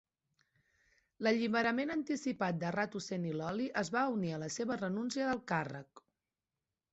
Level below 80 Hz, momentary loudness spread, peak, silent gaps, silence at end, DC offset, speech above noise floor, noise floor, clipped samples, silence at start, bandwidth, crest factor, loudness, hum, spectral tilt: -74 dBFS; 6 LU; -20 dBFS; none; 0.95 s; under 0.1%; over 54 dB; under -90 dBFS; under 0.1%; 1.2 s; 8 kHz; 18 dB; -36 LUFS; none; -4.5 dB/octave